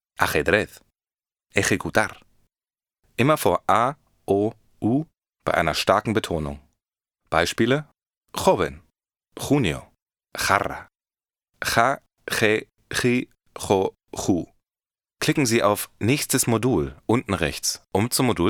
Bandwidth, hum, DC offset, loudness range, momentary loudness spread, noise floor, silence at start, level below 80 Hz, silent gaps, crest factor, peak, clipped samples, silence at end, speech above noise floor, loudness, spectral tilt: over 20 kHz; none; under 0.1%; 3 LU; 11 LU; under -90 dBFS; 0.2 s; -48 dBFS; 8.17-8.22 s, 10.02-10.06 s; 22 dB; 0 dBFS; under 0.1%; 0 s; over 68 dB; -23 LUFS; -4.5 dB/octave